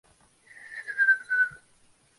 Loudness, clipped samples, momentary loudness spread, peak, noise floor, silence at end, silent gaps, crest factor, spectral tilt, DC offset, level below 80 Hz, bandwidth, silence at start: -24 LUFS; under 0.1%; 17 LU; -12 dBFS; -62 dBFS; 0.65 s; none; 18 dB; -1 dB/octave; under 0.1%; -74 dBFS; 11.5 kHz; 0.6 s